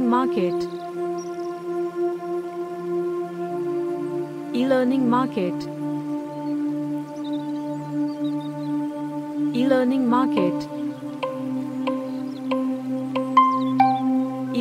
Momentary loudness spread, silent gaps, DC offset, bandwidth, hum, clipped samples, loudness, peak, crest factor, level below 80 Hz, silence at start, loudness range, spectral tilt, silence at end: 10 LU; none; under 0.1%; 13.5 kHz; none; under 0.1%; -24 LUFS; -4 dBFS; 20 dB; -70 dBFS; 0 s; 5 LU; -7 dB/octave; 0 s